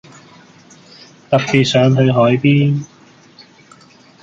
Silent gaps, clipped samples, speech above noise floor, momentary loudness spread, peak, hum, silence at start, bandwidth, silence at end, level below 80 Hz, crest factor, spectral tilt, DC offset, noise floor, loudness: none; under 0.1%; 33 dB; 7 LU; -2 dBFS; none; 1.3 s; 7.6 kHz; 1.35 s; -54 dBFS; 16 dB; -6.5 dB/octave; under 0.1%; -45 dBFS; -13 LUFS